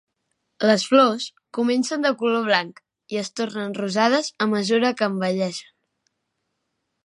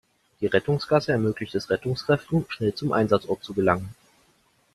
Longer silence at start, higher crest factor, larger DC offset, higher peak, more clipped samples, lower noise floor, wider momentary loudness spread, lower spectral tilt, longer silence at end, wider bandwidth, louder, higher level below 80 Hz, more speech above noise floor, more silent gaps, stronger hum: first, 0.6 s vs 0.4 s; about the same, 20 dB vs 22 dB; neither; about the same, -2 dBFS vs -4 dBFS; neither; first, -77 dBFS vs -64 dBFS; first, 12 LU vs 6 LU; second, -4.5 dB/octave vs -7 dB/octave; first, 1.4 s vs 0.85 s; second, 11.5 kHz vs 13.5 kHz; first, -22 LUFS vs -25 LUFS; second, -76 dBFS vs -56 dBFS; first, 56 dB vs 40 dB; neither; neither